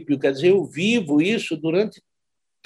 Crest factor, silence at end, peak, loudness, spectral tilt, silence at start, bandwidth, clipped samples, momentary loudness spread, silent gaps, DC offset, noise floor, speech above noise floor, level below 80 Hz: 14 dB; 0.75 s; -6 dBFS; -21 LUFS; -5.5 dB/octave; 0 s; 12 kHz; under 0.1%; 5 LU; none; under 0.1%; -84 dBFS; 64 dB; -68 dBFS